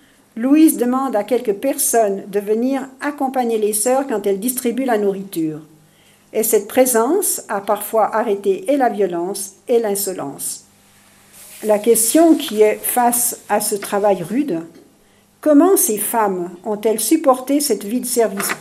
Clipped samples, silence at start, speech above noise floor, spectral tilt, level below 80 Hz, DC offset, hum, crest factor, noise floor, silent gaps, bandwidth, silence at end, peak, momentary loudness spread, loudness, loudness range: under 0.1%; 0.35 s; 36 dB; -3.5 dB/octave; -66 dBFS; under 0.1%; none; 18 dB; -53 dBFS; none; 16 kHz; 0 s; 0 dBFS; 11 LU; -17 LUFS; 4 LU